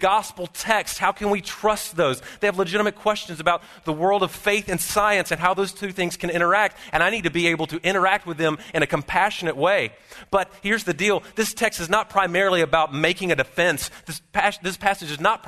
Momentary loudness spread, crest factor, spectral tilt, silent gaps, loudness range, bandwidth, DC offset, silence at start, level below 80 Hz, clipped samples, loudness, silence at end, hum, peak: 6 LU; 20 dB; -3.5 dB/octave; none; 2 LU; 13.5 kHz; under 0.1%; 0 s; -50 dBFS; under 0.1%; -22 LUFS; 0 s; none; -2 dBFS